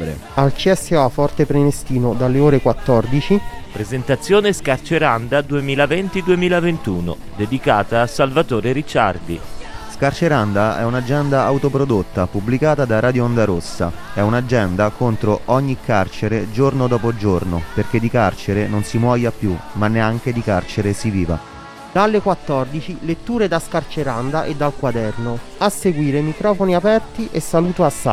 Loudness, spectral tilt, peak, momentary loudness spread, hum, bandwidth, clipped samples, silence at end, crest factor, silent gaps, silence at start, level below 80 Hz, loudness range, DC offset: -18 LUFS; -6.5 dB/octave; 0 dBFS; 8 LU; none; 15.5 kHz; under 0.1%; 0 s; 16 dB; none; 0 s; -36 dBFS; 3 LU; under 0.1%